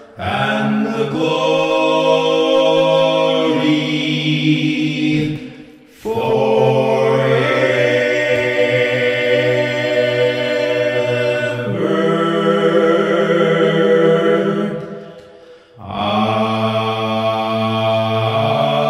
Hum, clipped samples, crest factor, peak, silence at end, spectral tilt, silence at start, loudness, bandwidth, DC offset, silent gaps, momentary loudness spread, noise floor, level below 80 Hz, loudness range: none; under 0.1%; 14 dB; -2 dBFS; 0 s; -6 dB/octave; 0 s; -15 LUFS; 12.5 kHz; under 0.1%; none; 6 LU; -42 dBFS; -56 dBFS; 3 LU